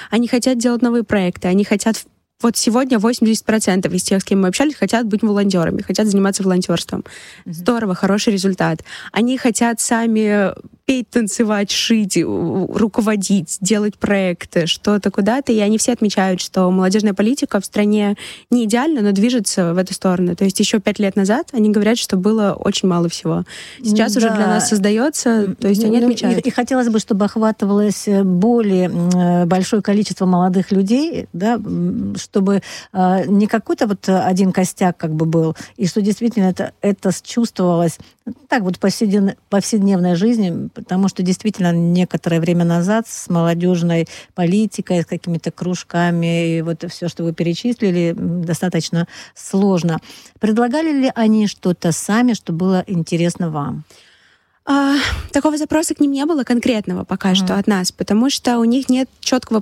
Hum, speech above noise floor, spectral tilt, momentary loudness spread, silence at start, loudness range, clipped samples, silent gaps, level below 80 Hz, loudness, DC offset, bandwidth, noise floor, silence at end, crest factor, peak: none; 39 dB; -5.5 dB/octave; 6 LU; 0 s; 3 LU; under 0.1%; none; -48 dBFS; -17 LUFS; under 0.1%; 14 kHz; -55 dBFS; 0 s; 12 dB; -4 dBFS